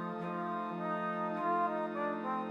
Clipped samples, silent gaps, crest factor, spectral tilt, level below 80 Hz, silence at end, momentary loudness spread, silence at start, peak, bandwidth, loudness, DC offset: under 0.1%; none; 14 dB; -8 dB/octave; -86 dBFS; 0 s; 5 LU; 0 s; -22 dBFS; 9.2 kHz; -36 LUFS; under 0.1%